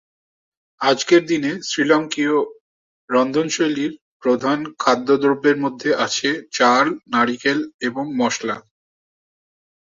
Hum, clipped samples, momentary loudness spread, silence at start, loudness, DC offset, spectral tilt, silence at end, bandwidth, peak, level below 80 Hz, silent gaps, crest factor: none; under 0.1%; 9 LU; 0.8 s; -19 LUFS; under 0.1%; -3.5 dB/octave; 1.2 s; 7.6 kHz; -2 dBFS; -66 dBFS; 2.60-3.08 s, 4.01-4.20 s, 7.74-7.79 s; 18 dB